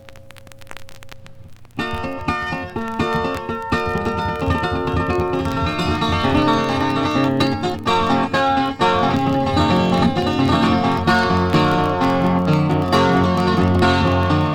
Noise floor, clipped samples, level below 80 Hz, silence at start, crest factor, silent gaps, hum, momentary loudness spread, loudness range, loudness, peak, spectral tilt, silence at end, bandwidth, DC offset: -39 dBFS; under 0.1%; -38 dBFS; 0.05 s; 16 dB; none; none; 7 LU; 7 LU; -18 LUFS; -2 dBFS; -6.5 dB/octave; 0 s; 17 kHz; under 0.1%